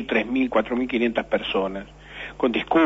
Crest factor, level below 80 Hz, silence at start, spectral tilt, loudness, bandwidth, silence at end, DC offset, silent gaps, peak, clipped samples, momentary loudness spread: 16 dB; -50 dBFS; 0 s; -6.5 dB/octave; -24 LUFS; 7.8 kHz; 0 s; under 0.1%; none; -8 dBFS; under 0.1%; 14 LU